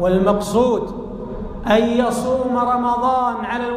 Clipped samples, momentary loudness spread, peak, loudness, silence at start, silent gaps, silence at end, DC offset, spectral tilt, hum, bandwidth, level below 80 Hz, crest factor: under 0.1%; 13 LU; -4 dBFS; -18 LUFS; 0 s; none; 0 s; under 0.1%; -6 dB/octave; none; 15.5 kHz; -38 dBFS; 14 dB